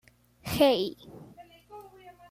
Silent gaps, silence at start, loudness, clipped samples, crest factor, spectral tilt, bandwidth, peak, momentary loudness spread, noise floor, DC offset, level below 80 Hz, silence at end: none; 0.45 s; -26 LUFS; under 0.1%; 20 dB; -5 dB/octave; 16 kHz; -10 dBFS; 25 LU; -52 dBFS; under 0.1%; -56 dBFS; 0.2 s